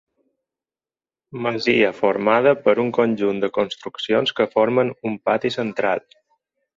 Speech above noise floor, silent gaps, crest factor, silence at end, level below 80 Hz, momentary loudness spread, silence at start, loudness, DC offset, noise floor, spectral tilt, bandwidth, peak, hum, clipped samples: over 70 dB; none; 18 dB; 0.75 s; -64 dBFS; 9 LU; 1.35 s; -20 LUFS; under 0.1%; under -90 dBFS; -6 dB/octave; 7.6 kHz; -2 dBFS; none; under 0.1%